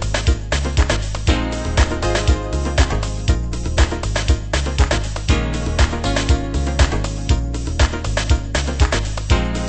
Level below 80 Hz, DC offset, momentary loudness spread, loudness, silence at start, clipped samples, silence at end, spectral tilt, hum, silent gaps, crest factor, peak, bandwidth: -20 dBFS; under 0.1%; 3 LU; -19 LUFS; 0 s; under 0.1%; 0 s; -5 dB/octave; none; none; 16 dB; 0 dBFS; 8.8 kHz